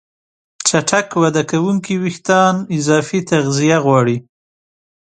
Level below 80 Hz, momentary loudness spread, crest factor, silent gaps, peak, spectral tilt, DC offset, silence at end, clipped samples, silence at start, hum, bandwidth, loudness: -58 dBFS; 6 LU; 16 dB; none; 0 dBFS; -5 dB/octave; under 0.1%; 0.8 s; under 0.1%; 0.6 s; none; 9.6 kHz; -15 LUFS